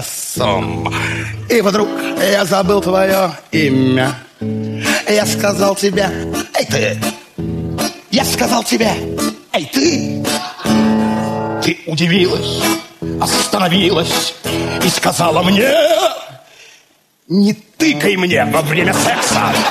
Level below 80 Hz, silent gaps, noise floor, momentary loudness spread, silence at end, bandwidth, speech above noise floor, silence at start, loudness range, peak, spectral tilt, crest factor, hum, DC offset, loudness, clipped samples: -42 dBFS; none; -53 dBFS; 8 LU; 0 s; 14 kHz; 39 dB; 0 s; 3 LU; 0 dBFS; -4 dB/octave; 14 dB; none; under 0.1%; -15 LUFS; under 0.1%